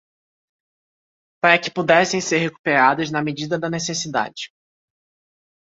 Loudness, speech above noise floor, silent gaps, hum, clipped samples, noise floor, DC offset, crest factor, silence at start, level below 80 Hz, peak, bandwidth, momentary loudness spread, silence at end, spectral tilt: -19 LUFS; over 71 dB; 2.59-2.64 s; none; under 0.1%; under -90 dBFS; under 0.1%; 20 dB; 1.45 s; -64 dBFS; -2 dBFS; 8 kHz; 8 LU; 1.15 s; -3.5 dB/octave